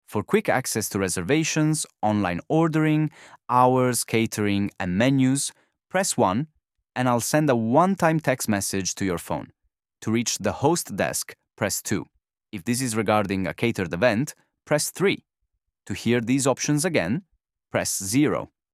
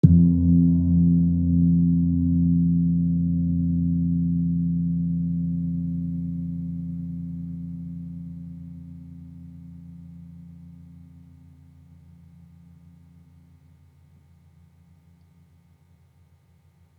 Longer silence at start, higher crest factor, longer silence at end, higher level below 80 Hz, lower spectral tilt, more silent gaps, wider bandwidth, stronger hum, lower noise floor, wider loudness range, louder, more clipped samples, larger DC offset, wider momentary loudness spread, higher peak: about the same, 0.1 s vs 0.05 s; about the same, 20 dB vs 24 dB; second, 0.25 s vs 6.15 s; second, -58 dBFS vs -46 dBFS; second, -4.5 dB/octave vs -13.5 dB/octave; neither; first, 15.5 kHz vs 1 kHz; neither; first, -78 dBFS vs -58 dBFS; second, 4 LU vs 24 LU; about the same, -23 LUFS vs -23 LUFS; neither; neither; second, 9 LU vs 24 LU; about the same, -4 dBFS vs -2 dBFS